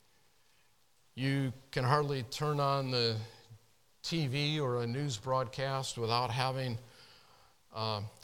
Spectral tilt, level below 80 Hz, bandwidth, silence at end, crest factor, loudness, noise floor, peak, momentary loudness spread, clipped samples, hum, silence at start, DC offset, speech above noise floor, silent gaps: -5.5 dB/octave; -66 dBFS; 16.5 kHz; 0.1 s; 22 dB; -34 LUFS; -72 dBFS; -14 dBFS; 9 LU; under 0.1%; none; 1.15 s; under 0.1%; 38 dB; none